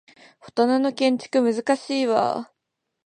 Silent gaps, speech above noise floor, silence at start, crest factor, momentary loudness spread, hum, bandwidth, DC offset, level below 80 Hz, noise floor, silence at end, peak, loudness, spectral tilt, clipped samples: none; 59 dB; 0.45 s; 18 dB; 9 LU; none; 10.5 kHz; under 0.1%; -74 dBFS; -80 dBFS; 0.6 s; -6 dBFS; -22 LUFS; -4.5 dB/octave; under 0.1%